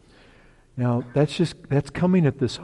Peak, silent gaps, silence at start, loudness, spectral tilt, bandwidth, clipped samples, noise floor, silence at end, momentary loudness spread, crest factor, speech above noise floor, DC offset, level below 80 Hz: -8 dBFS; none; 0.75 s; -23 LUFS; -7.5 dB/octave; 11 kHz; under 0.1%; -53 dBFS; 0 s; 7 LU; 14 dB; 31 dB; under 0.1%; -52 dBFS